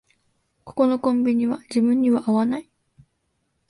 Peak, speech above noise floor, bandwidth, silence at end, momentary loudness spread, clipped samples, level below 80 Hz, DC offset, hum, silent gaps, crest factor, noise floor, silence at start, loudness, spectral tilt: -6 dBFS; 52 dB; 11.5 kHz; 1.05 s; 6 LU; under 0.1%; -64 dBFS; under 0.1%; none; none; 16 dB; -72 dBFS; 0.65 s; -21 LUFS; -7 dB/octave